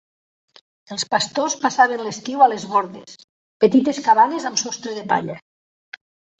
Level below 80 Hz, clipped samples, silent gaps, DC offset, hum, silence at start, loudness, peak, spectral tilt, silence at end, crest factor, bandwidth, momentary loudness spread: -68 dBFS; under 0.1%; 3.24-3.60 s; under 0.1%; none; 0.9 s; -19 LUFS; -2 dBFS; -3 dB/octave; 1 s; 18 dB; 8.4 kHz; 15 LU